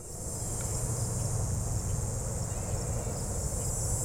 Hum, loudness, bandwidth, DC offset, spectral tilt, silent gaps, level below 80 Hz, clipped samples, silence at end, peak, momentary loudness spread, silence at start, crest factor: none; -33 LUFS; 16.5 kHz; under 0.1%; -4.5 dB/octave; none; -40 dBFS; under 0.1%; 0 s; -18 dBFS; 2 LU; 0 s; 14 dB